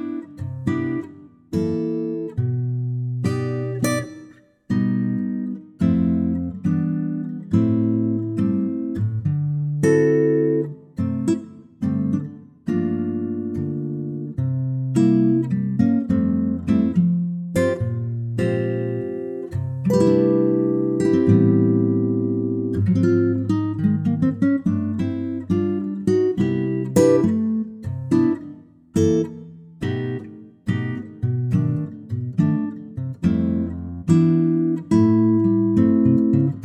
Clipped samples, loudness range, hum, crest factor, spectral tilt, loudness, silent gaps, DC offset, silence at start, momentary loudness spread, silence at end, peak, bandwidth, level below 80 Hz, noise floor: under 0.1%; 6 LU; none; 16 dB; -8.5 dB/octave; -21 LUFS; none; under 0.1%; 0 s; 11 LU; 0 s; -4 dBFS; 13.5 kHz; -50 dBFS; -47 dBFS